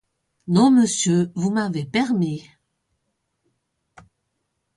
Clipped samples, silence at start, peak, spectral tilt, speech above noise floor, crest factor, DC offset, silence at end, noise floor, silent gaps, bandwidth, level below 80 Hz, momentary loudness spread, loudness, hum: under 0.1%; 0.45 s; -6 dBFS; -5 dB/octave; 56 dB; 18 dB; under 0.1%; 2.35 s; -75 dBFS; none; 11.5 kHz; -64 dBFS; 10 LU; -20 LUFS; none